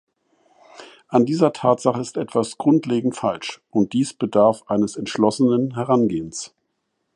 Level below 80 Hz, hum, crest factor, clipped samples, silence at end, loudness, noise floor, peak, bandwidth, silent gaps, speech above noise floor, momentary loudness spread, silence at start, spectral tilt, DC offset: -60 dBFS; none; 18 dB; under 0.1%; 0.7 s; -20 LUFS; -74 dBFS; -2 dBFS; 11.5 kHz; none; 54 dB; 8 LU; 0.75 s; -6 dB/octave; under 0.1%